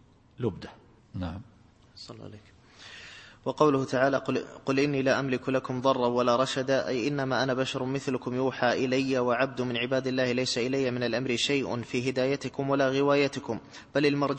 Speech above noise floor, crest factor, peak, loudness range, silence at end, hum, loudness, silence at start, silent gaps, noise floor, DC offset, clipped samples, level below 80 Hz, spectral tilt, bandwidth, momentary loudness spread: 21 dB; 22 dB; -8 dBFS; 4 LU; 0 s; none; -28 LUFS; 0.4 s; none; -49 dBFS; under 0.1%; under 0.1%; -62 dBFS; -5 dB/octave; 8.8 kHz; 19 LU